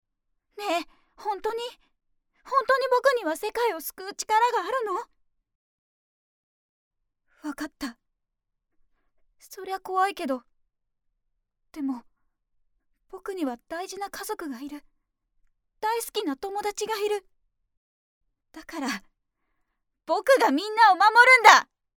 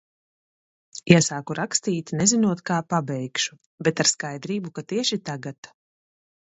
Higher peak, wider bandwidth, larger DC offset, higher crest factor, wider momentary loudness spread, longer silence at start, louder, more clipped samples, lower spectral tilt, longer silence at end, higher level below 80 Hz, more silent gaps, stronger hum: about the same, 0 dBFS vs 0 dBFS; first, 20 kHz vs 8.2 kHz; neither; about the same, 26 dB vs 24 dB; first, 20 LU vs 13 LU; second, 0.55 s vs 0.95 s; about the same, -23 LUFS vs -23 LUFS; neither; second, -1 dB/octave vs -4 dB/octave; second, 0.35 s vs 0.8 s; second, -68 dBFS vs -62 dBFS; first, 5.55-6.91 s, 17.77-18.21 s vs 3.66-3.78 s, 5.58-5.63 s; neither